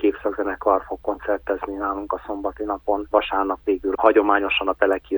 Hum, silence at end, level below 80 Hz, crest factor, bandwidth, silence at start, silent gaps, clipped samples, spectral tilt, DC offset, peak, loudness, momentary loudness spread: none; 0 s; -48 dBFS; 20 dB; over 20 kHz; 0 s; none; under 0.1%; -6.5 dB/octave; under 0.1%; -2 dBFS; -22 LUFS; 10 LU